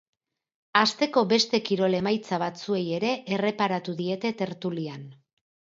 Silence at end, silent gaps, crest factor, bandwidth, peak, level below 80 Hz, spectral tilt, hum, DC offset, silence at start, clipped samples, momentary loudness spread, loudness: 0.6 s; none; 20 dB; 7.8 kHz; -6 dBFS; -72 dBFS; -5 dB/octave; none; under 0.1%; 0.75 s; under 0.1%; 9 LU; -26 LUFS